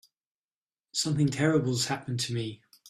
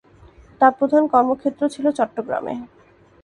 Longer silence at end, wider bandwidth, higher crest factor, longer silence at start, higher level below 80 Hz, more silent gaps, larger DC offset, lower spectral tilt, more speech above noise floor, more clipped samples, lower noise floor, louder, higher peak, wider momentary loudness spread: second, 0 s vs 0.55 s; first, 14 kHz vs 11 kHz; about the same, 18 dB vs 20 dB; first, 0.95 s vs 0.6 s; second, -64 dBFS vs -58 dBFS; neither; neither; second, -4.5 dB/octave vs -6 dB/octave; first, over 62 dB vs 29 dB; neither; first, under -90 dBFS vs -48 dBFS; second, -28 LUFS vs -19 LUFS; second, -12 dBFS vs 0 dBFS; about the same, 9 LU vs 10 LU